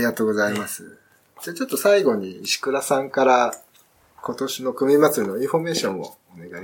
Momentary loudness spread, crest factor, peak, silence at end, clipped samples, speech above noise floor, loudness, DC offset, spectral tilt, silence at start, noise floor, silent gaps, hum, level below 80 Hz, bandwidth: 17 LU; 18 dB; -4 dBFS; 0 s; under 0.1%; 35 dB; -21 LUFS; under 0.1%; -4 dB/octave; 0 s; -57 dBFS; none; none; -72 dBFS; 17.5 kHz